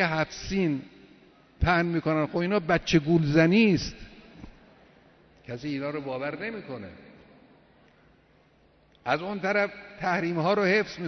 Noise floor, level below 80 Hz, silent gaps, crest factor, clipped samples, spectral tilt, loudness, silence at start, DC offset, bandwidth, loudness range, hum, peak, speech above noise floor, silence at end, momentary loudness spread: -61 dBFS; -46 dBFS; none; 20 dB; under 0.1%; -6.5 dB/octave; -26 LUFS; 0 s; under 0.1%; 6.4 kHz; 12 LU; none; -8 dBFS; 35 dB; 0 s; 16 LU